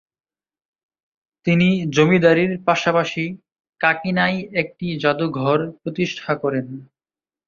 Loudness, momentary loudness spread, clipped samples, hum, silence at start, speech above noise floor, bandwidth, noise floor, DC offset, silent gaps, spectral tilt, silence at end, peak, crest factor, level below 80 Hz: -19 LUFS; 11 LU; under 0.1%; none; 1.45 s; over 71 dB; 7.2 kHz; under -90 dBFS; under 0.1%; 3.69-3.73 s; -6.5 dB/octave; 0.65 s; -2 dBFS; 20 dB; -58 dBFS